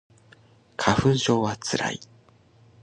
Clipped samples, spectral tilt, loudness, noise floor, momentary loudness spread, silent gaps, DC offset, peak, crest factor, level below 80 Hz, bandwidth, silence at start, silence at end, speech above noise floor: under 0.1%; -5 dB/octave; -24 LUFS; -56 dBFS; 13 LU; none; under 0.1%; -2 dBFS; 24 dB; -50 dBFS; 11 kHz; 0.8 s; 0.8 s; 33 dB